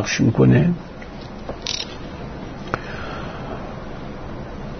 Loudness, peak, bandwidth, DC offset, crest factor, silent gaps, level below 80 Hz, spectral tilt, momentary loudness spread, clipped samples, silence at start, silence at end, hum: -23 LUFS; 0 dBFS; 6.6 kHz; under 0.1%; 22 dB; none; -38 dBFS; -6 dB/octave; 18 LU; under 0.1%; 0 s; 0 s; none